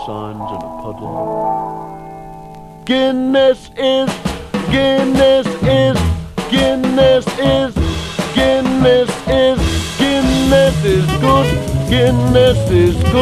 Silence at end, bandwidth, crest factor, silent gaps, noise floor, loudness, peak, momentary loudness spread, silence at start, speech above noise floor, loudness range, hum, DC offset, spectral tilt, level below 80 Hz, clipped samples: 0 s; 14 kHz; 14 dB; none; -33 dBFS; -14 LUFS; 0 dBFS; 14 LU; 0 s; 20 dB; 4 LU; none; under 0.1%; -6 dB/octave; -28 dBFS; under 0.1%